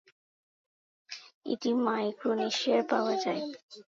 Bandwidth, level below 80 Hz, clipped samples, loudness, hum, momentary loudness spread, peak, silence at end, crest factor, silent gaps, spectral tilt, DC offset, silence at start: 7.8 kHz; -86 dBFS; under 0.1%; -30 LUFS; none; 18 LU; -14 dBFS; 0.15 s; 18 dB; 1.34-1.41 s, 3.63-3.69 s; -4 dB/octave; under 0.1%; 1.1 s